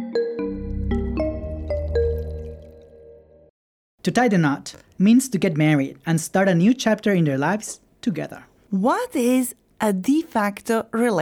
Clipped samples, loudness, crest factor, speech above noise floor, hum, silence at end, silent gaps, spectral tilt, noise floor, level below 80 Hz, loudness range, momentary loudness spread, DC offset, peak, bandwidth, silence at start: under 0.1%; -22 LUFS; 16 dB; 28 dB; none; 0 s; 3.50-3.98 s; -6 dB/octave; -47 dBFS; -38 dBFS; 8 LU; 12 LU; under 0.1%; -6 dBFS; 19.5 kHz; 0 s